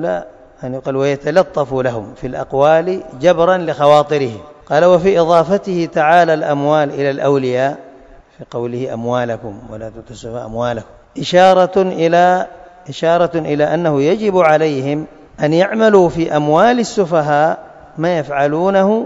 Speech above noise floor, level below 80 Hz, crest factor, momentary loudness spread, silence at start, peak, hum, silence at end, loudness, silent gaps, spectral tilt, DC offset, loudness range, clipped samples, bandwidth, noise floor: 28 dB; -48 dBFS; 14 dB; 16 LU; 0 s; 0 dBFS; none; 0 s; -14 LUFS; none; -6 dB/octave; under 0.1%; 6 LU; 0.1%; 8 kHz; -41 dBFS